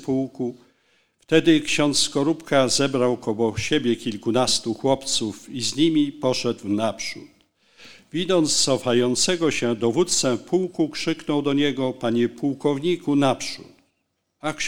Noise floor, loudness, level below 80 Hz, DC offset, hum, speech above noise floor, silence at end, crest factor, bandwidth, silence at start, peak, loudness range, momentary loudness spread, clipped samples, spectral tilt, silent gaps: -74 dBFS; -22 LUFS; -56 dBFS; 0.7%; none; 52 dB; 0 s; 20 dB; 16.5 kHz; 0 s; -2 dBFS; 3 LU; 9 LU; under 0.1%; -4 dB/octave; none